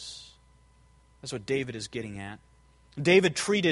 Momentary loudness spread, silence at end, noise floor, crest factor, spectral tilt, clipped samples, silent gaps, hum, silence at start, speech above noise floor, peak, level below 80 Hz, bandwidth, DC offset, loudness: 23 LU; 0 s; -60 dBFS; 24 dB; -4.5 dB/octave; under 0.1%; none; none; 0 s; 33 dB; -6 dBFS; -60 dBFS; 11.5 kHz; under 0.1%; -27 LUFS